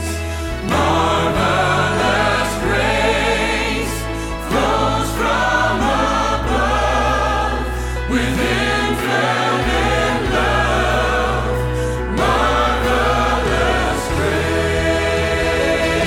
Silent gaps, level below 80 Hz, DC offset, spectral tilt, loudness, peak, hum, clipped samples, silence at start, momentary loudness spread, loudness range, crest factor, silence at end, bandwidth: none; -26 dBFS; under 0.1%; -4.5 dB/octave; -17 LUFS; -4 dBFS; none; under 0.1%; 0 s; 5 LU; 1 LU; 14 dB; 0 s; 16.5 kHz